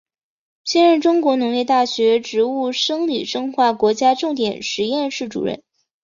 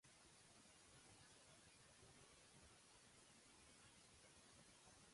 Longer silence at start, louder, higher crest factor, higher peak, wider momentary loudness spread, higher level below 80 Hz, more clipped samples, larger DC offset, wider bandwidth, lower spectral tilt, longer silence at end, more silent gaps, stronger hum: first, 0.65 s vs 0.05 s; first, -18 LUFS vs -67 LUFS; about the same, 16 dB vs 14 dB; first, -4 dBFS vs -54 dBFS; first, 9 LU vs 1 LU; first, -64 dBFS vs -84 dBFS; neither; neither; second, 7.6 kHz vs 11.5 kHz; about the same, -3.5 dB/octave vs -2.5 dB/octave; first, 0.5 s vs 0 s; neither; neither